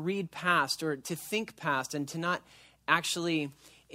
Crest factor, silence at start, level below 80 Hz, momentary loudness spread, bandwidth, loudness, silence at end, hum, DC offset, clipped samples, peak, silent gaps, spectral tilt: 24 dB; 0 s; -72 dBFS; 9 LU; 16 kHz; -31 LUFS; 0 s; none; under 0.1%; under 0.1%; -10 dBFS; none; -3.5 dB/octave